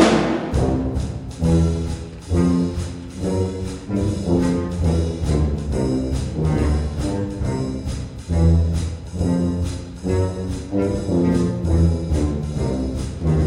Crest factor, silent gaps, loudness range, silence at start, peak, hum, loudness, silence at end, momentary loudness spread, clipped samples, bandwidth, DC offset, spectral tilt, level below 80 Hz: 18 dB; none; 1 LU; 0 s; -2 dBFS; none; -22 LUFS; 0 s; 9 LU; under 0.1%; 11.5 kHz; under 0.1%; -7.5 dB/octave; -28 dBFS